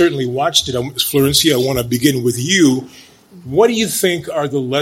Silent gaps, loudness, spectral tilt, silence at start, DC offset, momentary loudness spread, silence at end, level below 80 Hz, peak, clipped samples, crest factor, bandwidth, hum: none; -15 LUFS; -4 dB/octave; 0 s; under 0.1%; 7 LU; 0 s; -44 dBFS; 0 dBFS; under 0.1%; 16 dB; 16.5 kHz; none